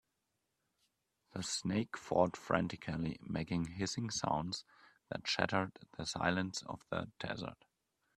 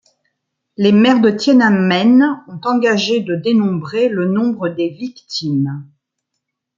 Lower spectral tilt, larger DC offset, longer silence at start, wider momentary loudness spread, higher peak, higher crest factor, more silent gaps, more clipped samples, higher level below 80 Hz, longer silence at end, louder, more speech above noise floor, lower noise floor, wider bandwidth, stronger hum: second, -4.5 dB/octave vs -6 dB/octave; neither; first, 1.35 s vs 0.8 s; about the same, 10 LU vs 11 LU; second, -12 dBFS vs -2 dBFS; first, 26 dB vs 14 dB; neither; neither; about the same, -66 dBFS vs -62 dBFS; second, 0.65 s vs 0.95 s; second, -38 LUFS vs -15 LUFS; second, 47 dB vs 62 dB; first, -85 dBFS vs -76 dBFS; first, 13 kHz vs 7.6 kHz; neither